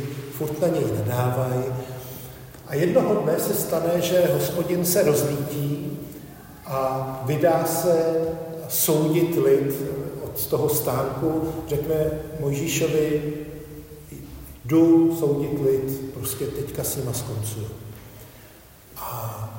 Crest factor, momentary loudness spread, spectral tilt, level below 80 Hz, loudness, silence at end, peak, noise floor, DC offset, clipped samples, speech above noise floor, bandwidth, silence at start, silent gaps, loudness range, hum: 18 dB; 19 LU; -5.5 dB/octave; -50 dBFS; -23 LUFS; 0 s; -6 dBFS; -47 dBFS; under 0.1%; under 0.1%; 25 dB; 16.5 kHz; 0 s; none; 5 LU; none